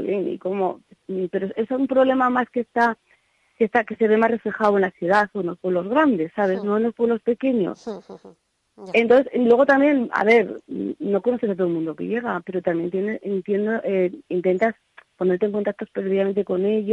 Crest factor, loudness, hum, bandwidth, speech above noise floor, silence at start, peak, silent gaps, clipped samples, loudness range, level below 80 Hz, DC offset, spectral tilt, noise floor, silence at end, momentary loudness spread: 16 dB; -21 LUFS; none; 9 kHz; 41 dB; 0 s; -6 dBFS; none; under 0.1%; 5 LU; -66 dBFS; under 0.1%; -7.5 dB/octave; -62 dBFS; 0 s; 10 LU